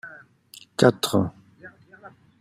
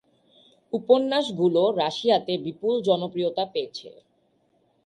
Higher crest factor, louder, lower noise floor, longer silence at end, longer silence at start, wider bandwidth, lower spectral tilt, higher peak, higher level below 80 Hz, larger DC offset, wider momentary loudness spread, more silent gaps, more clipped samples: about the same, 24 dB vs 20 dB; about the same, -22 LUFS vs -24 LUFS; second, -51 dBFS vs -67 dBFS; second, 0.35 s vs 0.95 s; second, 0.05 s vs 0.75 s; first, 16 kHz vs 11 kHz; about the same, -5.5 dB/octave vs -6 dB/octave; first, -2 dBFS vs -6 dBFS; first, -62 dBFS vs -72 dBFS; neither; first, 17 LU vs 11 LU; neither; neither